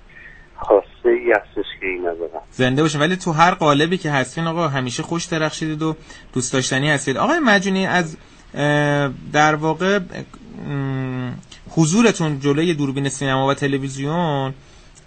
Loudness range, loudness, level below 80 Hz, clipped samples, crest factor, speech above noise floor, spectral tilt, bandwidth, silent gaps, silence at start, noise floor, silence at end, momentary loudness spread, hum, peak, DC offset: 2 LU; -19 LUFS; -48 dBFS; under 0.1%; 20 dB; 23 dB; -5 dB/octave; 9 kHz; none; 0.15 s; -42 dBFS; 0.5 s; 13 LU; none; 0 dBFS; under 0.1%